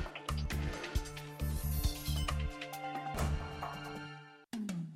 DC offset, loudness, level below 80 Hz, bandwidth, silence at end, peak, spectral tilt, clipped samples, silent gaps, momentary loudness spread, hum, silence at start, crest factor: under 0.1%; -39 LUFS; -42 dBFS; 16 kHz; 0 s; -20 dBFS; -5 dB/octave; under 0.1%; none; 9 LU; none; 0 s; 18 dB